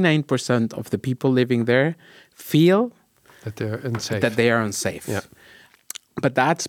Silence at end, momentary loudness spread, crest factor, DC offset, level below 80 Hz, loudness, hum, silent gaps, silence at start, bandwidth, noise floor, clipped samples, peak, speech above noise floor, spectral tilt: 0 s; 17 LU; 18 dB; under 0.1%; -66 dBFS; -22 LUFS; none; none; 0 s; 18 kHz; -51 dBFS; under 0.1%; -4 dBFS; 30 dB; -5.5 dB/octave